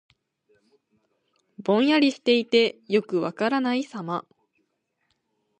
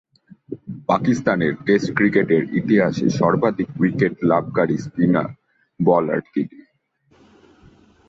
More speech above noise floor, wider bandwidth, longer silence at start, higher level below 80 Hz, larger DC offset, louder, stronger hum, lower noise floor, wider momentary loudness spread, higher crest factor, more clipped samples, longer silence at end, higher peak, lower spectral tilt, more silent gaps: first, 52 dB vs 43 dB; first, 9.6 kHz vs 7.8 kHz; first, 1.6 s vs 0.5 s; second, -78 dBFS vs -56 dBFS; neither; second, -23 LUFS vs -19 LUFS; neither; first, -75 dBFS vs -62 dBFS; first, 12 LU vs 9 LU; about the same, 20 dB vs 18 dB; neither; second, 1.4 s vs 1.6 s; second, -6 dBFS vs -2 dBFS; second, -5.5 dB/octave vs -7.5 dB/octave; neither